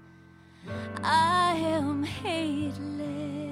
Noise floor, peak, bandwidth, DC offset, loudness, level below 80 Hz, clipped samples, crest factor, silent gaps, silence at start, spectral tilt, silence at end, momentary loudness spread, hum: -53 dBFS; -14 dBFS; 15 kHz; under 0.1%; -28 LUFS; -60 dBFS; under 0.1%; 16 dB; none; 0 s; -5 dB/octave; 0 s; 14 LU; none